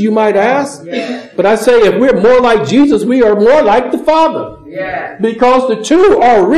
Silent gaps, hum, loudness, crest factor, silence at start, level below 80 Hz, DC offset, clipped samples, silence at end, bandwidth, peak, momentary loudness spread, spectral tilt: none; none; -10 LUFS; 10 dB; 0 s; -42 dBFS; 1%; under 0.1%; 0 s; 13.5 kHz; 0 dBFS; 12 LU; -5.5 dB/octave